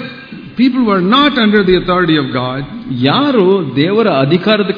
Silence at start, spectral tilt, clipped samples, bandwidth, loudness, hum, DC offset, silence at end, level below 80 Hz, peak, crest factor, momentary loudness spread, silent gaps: 0 s; -8.5 dB/octave; 0.1%; 5.4 kHz; -11 LUFS; none; under 0.1%; 0 s; -42 dBFS; 0 dBFS; 12 dB; 12 LU; none